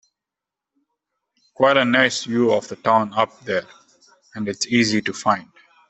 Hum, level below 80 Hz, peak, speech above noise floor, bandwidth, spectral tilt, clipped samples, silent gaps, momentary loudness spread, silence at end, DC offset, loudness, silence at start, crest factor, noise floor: none; -64 dBFS; -2 dBFS; 67 dB; 8.4 kHz; -4 dB/octave; under 0.1%; none; 10 LU; 0.45 s; under 0.1%; -20 LUFS; 1.6 s; 20 dB; -86 dBFS